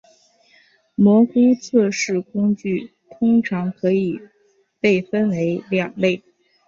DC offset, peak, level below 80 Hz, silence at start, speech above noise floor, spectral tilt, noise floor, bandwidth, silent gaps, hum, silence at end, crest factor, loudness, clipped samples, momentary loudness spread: under 0.1%; -4 dBFS; -62 dBFS; 1 s; 43 dB; -6.5 dB/octave; -61 dBFS; 7.6 kHz; none; none; 0.5 s; 16 dB; -19 LUFS; under 0.1%; 10 LU